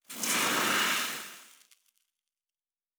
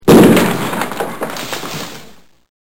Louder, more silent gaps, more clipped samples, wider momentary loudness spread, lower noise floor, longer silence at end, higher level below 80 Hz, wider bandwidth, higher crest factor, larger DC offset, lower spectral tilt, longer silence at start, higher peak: second, -27 LUFS vs -14 LUFS; neither; second, under 0.1% vs 0.6%; second, 13 LU vs 19 LU; first, under -90 dBFS vs -41 dBFS; first, 1.5 s vs 0.1 s; second, -82 dBFS vs -44 dBFS; first, over 20 kHz vs 17.5 kHz; first, 20 dB vs 14 dB; second, under 0.1% vs 2%; second, -0.5 dB/octave vs -5.5 dB/octave; about the same, 0.1 s vs 0 s; second, -14 dBFS vs 0 dBFS